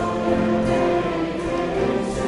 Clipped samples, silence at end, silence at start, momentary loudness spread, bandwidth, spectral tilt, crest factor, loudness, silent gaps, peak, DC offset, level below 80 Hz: under 0.1%; 0 s; 0 s; 4 LU; 11.5 kHz; -6.5 dB/octave; 12 dB; -22 LUFS; none; -8 dBFS; under 0.1%; -40 dBFS